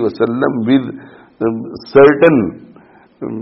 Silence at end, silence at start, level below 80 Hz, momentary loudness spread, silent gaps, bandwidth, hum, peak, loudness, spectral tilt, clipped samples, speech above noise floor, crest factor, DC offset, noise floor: 0 s; 0 s; -50 dBFS; 19 LU; none; 5.8 kHz; none; 0 dBFS; -13 LUFS; -6 dB/octave; under 0.1%; 32 dB; 14 dB; under 0.1%; -44 dBFS